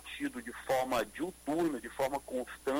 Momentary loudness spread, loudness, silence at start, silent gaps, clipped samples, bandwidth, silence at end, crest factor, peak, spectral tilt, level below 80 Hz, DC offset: 7 LU; -36 LUFS; 0 s; none; under 0.1%; 16.5 kHz; 0 s; 14 dB; -20 dBFS; -4.5 dB/octave; -62 dBFS; under 0.1%